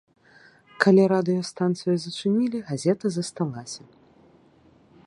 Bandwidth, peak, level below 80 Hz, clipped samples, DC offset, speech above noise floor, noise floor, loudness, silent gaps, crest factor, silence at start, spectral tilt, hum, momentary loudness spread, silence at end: 11 kHz; -2 dBFS; -68 dBFS; under 0.1%; under 0.1%; 34 dB; -57 dBFS; -24 LUFS; none; 24 dB; 0.8 s; -6 dB/octave; none; 12 LU; 1.3 s